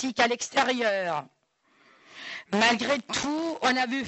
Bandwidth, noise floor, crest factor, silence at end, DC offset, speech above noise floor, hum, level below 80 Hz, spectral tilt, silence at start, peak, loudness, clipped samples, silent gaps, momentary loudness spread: 8.2 kHz; -66 dBFS; 18 dB; 0 s; under 0.1%; 40 dB; none; -66 dBFS; -2.5 dB/octave; 0 s; -10 dBFS; -26 LUFS; under 0.1%; none; 12 LU